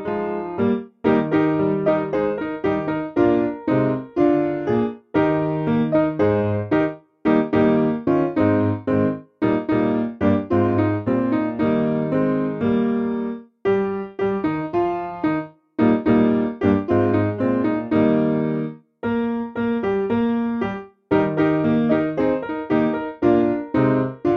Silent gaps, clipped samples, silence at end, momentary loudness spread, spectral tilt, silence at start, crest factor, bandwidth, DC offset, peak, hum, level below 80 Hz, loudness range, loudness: none; under 0.1%; 0 s; 6 LU; -10 dB/octave; 0 s; 14 dB; 5.6 kHz; under 0.1%; -6 dBFS; none; -50 dBFS; 2 LU; -21 LUFS